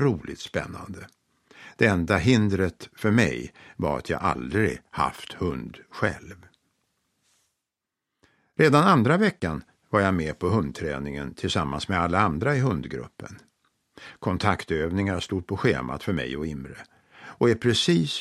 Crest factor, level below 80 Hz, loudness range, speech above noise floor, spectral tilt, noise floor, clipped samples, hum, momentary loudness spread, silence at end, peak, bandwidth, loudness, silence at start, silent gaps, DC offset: 22 dB; -48 dBFS; 6 LU; 61 dB; -6 dB/octave; -85 dBFS; under 0.1%; none; 16 LU; 0 s; -4 dBFS; 13.5 kHz; -25 LUFS; 0 s; none; under 0.1%